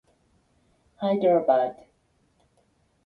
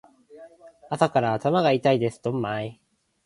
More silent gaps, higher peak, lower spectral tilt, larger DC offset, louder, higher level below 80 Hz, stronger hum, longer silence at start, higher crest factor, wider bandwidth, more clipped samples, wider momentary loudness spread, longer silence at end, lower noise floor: neither; second, -8 dBFS vs -4 dBFS; first, -8.5 dB/octave vs -6.5 dB/octave; neither; about the same, -24 LUFS vs -24 LUFS; second, -70 dBFS vs -64 dBFS; neither; first, 1 s vs 0.35 s; about the same, 18 dB vs 22 dB; second, 4.7 kHz vs 11.5 kHz; neither; about the same, 10 LU vs 11 LU; first, 1.3 s vs 0.5 s; first, -67 dBFS vs -49 dBFS